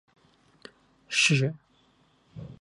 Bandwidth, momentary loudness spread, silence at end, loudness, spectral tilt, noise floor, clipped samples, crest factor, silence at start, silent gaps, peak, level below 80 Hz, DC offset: 11.5 kHz; 24 LU; 0.1 s; -24 LUFS; -3.5 dB/octave; -64 dBFS; under 0.1%; 20 dB; 1.1 s; none; -10 dBFS; -66 dBFS; under 0.1%